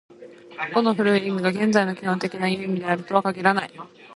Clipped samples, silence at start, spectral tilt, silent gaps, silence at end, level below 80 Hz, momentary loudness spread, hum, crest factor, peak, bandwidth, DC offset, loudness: under 0.1%; 0.1 s; -6 dB/octave; none; 0 s; -68 dBFS; 9 LU; none; 20 dB; -2 dBFS; 11.5 kHz; under 0.1%; -22 LUFS